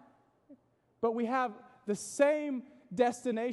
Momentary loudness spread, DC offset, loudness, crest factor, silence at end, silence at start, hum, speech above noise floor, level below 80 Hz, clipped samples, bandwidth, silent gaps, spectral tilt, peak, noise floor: 11 LU; under 0.1%; -33 LUFS; 20 dB; 0 s; 0.5 s; none; 33 dB; -80 dBFS; under 0.1%; 12 kHz; none; -4.5 dB/octave; -14 dBFS; -65 dBFS